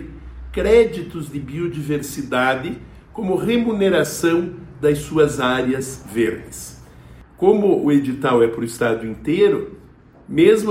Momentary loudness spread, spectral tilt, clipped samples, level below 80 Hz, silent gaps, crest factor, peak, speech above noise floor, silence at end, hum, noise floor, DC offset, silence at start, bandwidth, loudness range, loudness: 15 LU; -5.5 dB/octave; under 0.1%; -42 dBFS; none; 18 dB; -2 dBFS; 28 dB; 0 s; none; -46 dBFS; under 0.1%; 0 s; 16.5 kHz; 3 LU; -19 LUFS